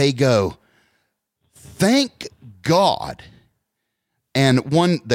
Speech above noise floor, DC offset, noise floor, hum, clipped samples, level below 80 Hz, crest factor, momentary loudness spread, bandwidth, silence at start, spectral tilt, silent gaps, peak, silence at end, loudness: 60 dB; under 0.1%; -77 dBFS; none; under 0.1%; -54 dBFS; 16 dB; 17 LU; 16.5 kHz; 0 s; -5.5 dB/octave; none; -4 dBFS; 0 s; -19 LUFS